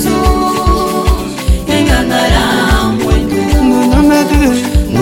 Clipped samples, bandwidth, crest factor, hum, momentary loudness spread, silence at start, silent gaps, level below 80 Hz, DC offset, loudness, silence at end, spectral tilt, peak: under 0.1%; 17 kHz; 10 dB; none; 5 LU; 0 s; none; -16 dBFS; under 0.1%; -11 LUFS; 0 s; -5.5 dB/octave; 0 dBFS